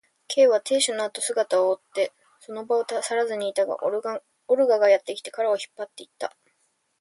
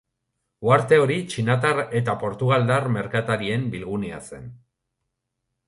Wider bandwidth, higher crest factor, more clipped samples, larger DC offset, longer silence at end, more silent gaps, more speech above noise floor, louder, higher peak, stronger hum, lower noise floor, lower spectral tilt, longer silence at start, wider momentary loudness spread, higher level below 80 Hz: about the same, 11.5 kHz vs 11.5 kHz; about the same, 18 dB vs 20 dB; neither; neither; second, 0.7 s vs 1.1 s; neither; second, 47 dB vs 58 dB; about the same, -24 LUFS vs -22 LUFS; second, -8 dBFS vs -4 dBFS; neither; second, -71 dBFS vs -79 dBFS; second, -1.5 dB/octave vs -6.5 dB/octave; second, 0.3 s vs 0.6 s; first, 16 LU vs 11 LU; second, -78 dBFS vs -56 dBFS